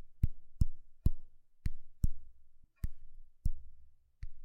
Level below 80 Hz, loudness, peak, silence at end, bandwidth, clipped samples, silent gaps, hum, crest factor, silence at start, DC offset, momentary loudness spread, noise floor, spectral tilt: -38 dBFS; -42 LUFS; -14 dBFS; 0 s; 2.2 kHz; under 0.1%; none; none; 20 dB; 0 s; under 0.1%; 17 LU; -55 dBFS; -8 dB/octave